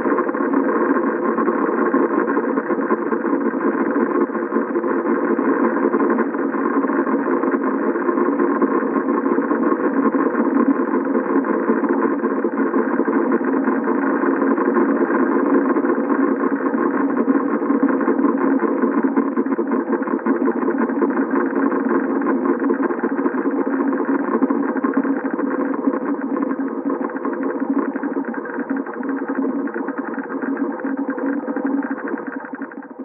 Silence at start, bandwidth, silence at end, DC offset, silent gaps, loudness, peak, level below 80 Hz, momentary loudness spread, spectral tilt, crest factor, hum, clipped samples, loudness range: 0 s; 2.8 kHz; 0 s; under 0.1%; none; -19 LUFS; -4 dBFS; -86 dBFS; 6 LU; -12.5 dB/octave; 16 dB; none; under 0.1%; 5 LU